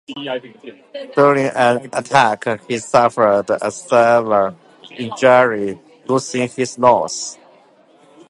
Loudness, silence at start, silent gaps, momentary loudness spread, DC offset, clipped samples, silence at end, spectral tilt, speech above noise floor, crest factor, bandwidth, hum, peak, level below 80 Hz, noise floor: -16 LUFS; 0.1 s; none; 14 LU; under 0.1%; under 0.1%; 0.95 s; -4.5 dB/octave; 34 dB; 16 dB; 11.5 kHz; none; 0 dBFS; -62 dBFS; -50 dBFS